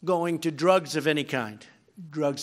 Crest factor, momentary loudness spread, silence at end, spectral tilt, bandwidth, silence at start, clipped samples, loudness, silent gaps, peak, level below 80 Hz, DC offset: 20 dB; 11 LU; 0 s; -5 dB/octave; 16 kHz; 0 s; under 0.1%; -26 LUFS; none; -6 dBFS; -78 dBFS; under 0.1%